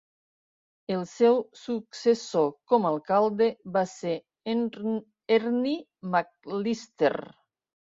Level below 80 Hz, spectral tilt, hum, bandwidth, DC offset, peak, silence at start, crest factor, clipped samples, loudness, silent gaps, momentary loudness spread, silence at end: -74 dBFS; -6 dB/octave; none; 7.8 kHz; under 0.1%; -10 dBFS; 0.9 s; 18 dB; under 0.1%; -27 LUFS; none; 11 LU; 0.6 s